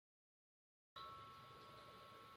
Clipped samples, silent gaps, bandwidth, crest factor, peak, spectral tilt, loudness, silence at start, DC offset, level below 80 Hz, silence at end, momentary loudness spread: under 0.1%; none; 16 kHz; 18 dB; -44 dBFS; -4 dB/octave; -59 LUFS; 0.95 s; under 0.1%; -84 dBFS; 0 s; 4 LU